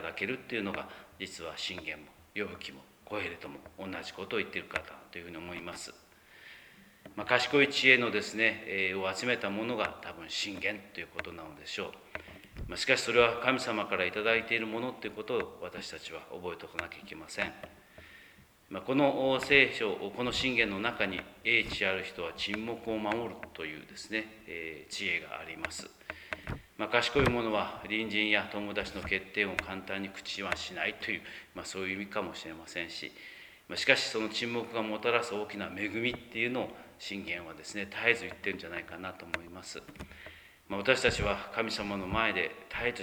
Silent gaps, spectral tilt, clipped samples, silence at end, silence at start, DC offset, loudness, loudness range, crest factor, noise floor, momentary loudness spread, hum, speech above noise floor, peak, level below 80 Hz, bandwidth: none; -3.5 dB/octave; under 0.1%; 0 s; 0 s; under 0.1%; -32 LUFS; 11 LU; 26 dB; -59 dBFS; 17 LU; none; 25 dB; -8 dBFS; -58 dBFS; over 20 kHz